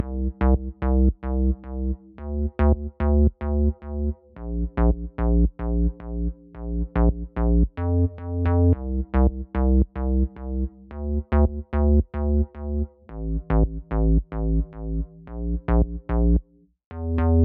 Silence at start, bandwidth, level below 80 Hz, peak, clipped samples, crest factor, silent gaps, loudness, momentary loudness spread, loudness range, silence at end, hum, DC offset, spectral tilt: 0 s; 3.2 kHz; -24 dBFS; -8 dBFS; under 0.1%; 14 dB; 16.86-16.91 s; -25 LUFS; 10 LU; 3 LU; 0 s; none; under 0.1%; -10.5 dB/octave